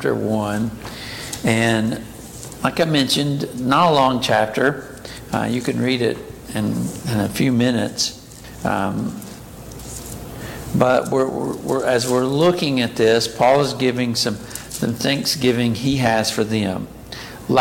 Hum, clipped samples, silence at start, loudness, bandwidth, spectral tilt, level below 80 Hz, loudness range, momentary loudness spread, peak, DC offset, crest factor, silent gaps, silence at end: none; under 0.1%; 0 s; -19 LUFS; 17 kHz; -5 dB/octave; -46 dBFS; 5 LU; 16 LU; -2 dBFS; under 0.1%; 18 dB; none; 0 s